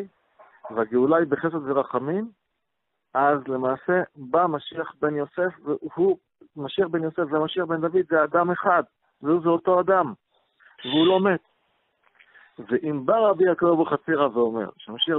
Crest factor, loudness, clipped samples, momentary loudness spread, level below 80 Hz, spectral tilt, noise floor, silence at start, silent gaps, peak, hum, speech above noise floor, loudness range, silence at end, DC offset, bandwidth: 16 dB; -23 LUFS; under 0.1%; 11 LU; -68 dBFS; -10 dB/octave; -80 dBFS; 0 s; none; -6 dBFS; none; 57 dB; 3 LU; 0 s; under 0.1%; 4.1 kHz